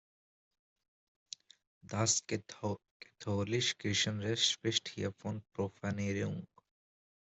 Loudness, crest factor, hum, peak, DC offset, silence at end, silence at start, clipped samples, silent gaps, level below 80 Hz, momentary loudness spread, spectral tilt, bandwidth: -35 LUFS; 24 dB; none; -14 dBFS; under 0.1%; 0.9 s; 1.85 s; under 0.1%; 2.91-3.00 s; -72 dBFS; 15 LU; -3.5 dB/octave; 8.2 kHz